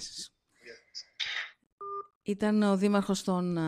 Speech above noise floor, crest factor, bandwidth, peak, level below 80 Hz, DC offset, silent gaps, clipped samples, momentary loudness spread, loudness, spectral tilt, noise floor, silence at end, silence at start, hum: 27 dB; 18 dB; 13 kHz; -14 dBFS; -66 dBFS; under 0.1%; 1.72-1.78 s, 2.15-2.21 s; under 0.1%; 19 LU; -30 LUFS; -5.5 dB/octave; -54 dBFS; 0 s; 0 s; none